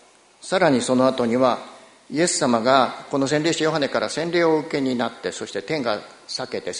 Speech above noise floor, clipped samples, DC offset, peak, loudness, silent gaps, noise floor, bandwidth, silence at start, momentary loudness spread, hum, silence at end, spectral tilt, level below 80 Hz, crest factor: 22 dB; under 0.1%; under 0.1%; -2 dBFS; -21 LUFS; none; -44 dBFS; 11 kHz; 0.45 s; 11 LU; none; 0 s; -4 dB/octave; -62 dBFS; 20 dB